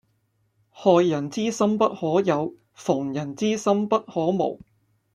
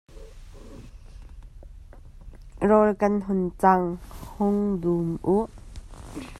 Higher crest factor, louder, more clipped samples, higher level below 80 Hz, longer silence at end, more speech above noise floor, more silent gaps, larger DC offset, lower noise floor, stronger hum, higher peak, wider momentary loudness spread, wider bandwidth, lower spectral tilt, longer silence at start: about the same, 20 dB vs 22 dB; about the same, -23 LUFS vs -24 LUFS; neither; second, -66 dBFS vs -44 dBFS; first, 0.6 s vs 0 s; first, 47 dB vs 22 dB; neither; neither; first, -69 dBFS vs -44 dBFS; neither; about the same, -4 dBFS vs -4 dBFS; second, 9 LU vs 25 LU; about the same, 12 kHz vs 13 kHz; second, -6 dB/octave vs -8.5 dB/octave; first, 0.75 s vs 0.15 s